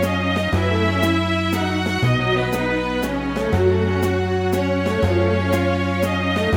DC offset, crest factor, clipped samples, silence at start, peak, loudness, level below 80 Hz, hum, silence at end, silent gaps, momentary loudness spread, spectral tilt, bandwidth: under 0.1%; 14 dB; under 0.1%; 0 s; -4 dBFS; -20 LUFS; -38 dBFS; none; 0 s; none; 3 LU; -6.5 dB/octave; 17.5 kHz